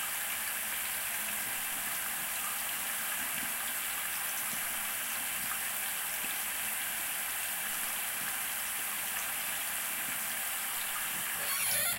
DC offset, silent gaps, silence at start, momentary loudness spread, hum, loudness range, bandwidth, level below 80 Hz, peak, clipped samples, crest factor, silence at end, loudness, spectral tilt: under 0.1%; none; 0 s; 0 LU; none; 0 LU; 16 kHz; -66 dBFS; -18 dBFS; under 0.1%; 18 dB; 0 s; -32 LUFS; 1 dB/octave